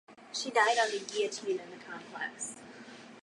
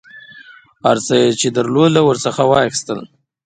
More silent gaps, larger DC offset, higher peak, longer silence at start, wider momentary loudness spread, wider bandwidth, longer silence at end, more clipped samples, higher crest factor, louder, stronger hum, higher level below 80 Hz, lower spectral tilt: neither; neither; second, -14 dBFS vs 0 dBFS; about the same, 0.1 s vs 0.15 s; first, 21 LU vs 9 LU; first, 11.5 kHz vs 9.6 kHz; second, 0.05 s vs 0.4 s; neither; about the same, 20 dB vs 16 dB; second, -32 LUFS vs -14 LUFS; neither; second, -86 dBFS vs -54 dBFS; second, -1 dB/octave vs -4.5 dB/octave